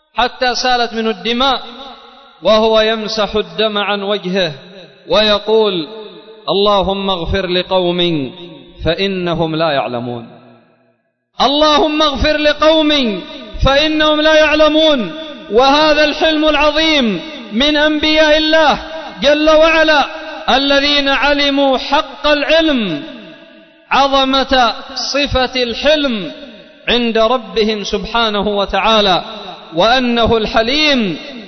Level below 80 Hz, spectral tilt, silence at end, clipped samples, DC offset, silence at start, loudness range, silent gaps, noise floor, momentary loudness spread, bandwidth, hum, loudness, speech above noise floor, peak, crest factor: -32 dBFS; -4 dB/octave; 0 s; under 0.1%; under 0.1%; 0.15 s; 5 LU; none; -60 dBFS; 12 LU; 6.4 kHz; none; -13 LUFS; 47 dB; -2 dBFS; 12 dB